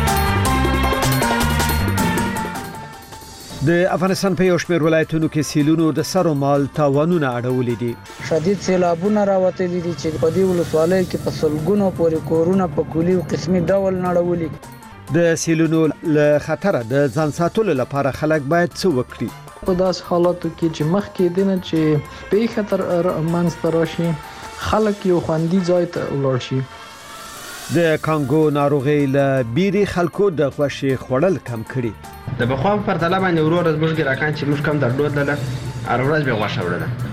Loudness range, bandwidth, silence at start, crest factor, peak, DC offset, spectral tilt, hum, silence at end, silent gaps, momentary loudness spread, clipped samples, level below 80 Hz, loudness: 2 LU; 16 kHz; 0 s; 14 dB; -4 dBFS; under 0.1%; -6 dB/octave; none; 0 s; none; 8 LU; under 0.1%; -36 dBFS; -19 LUFS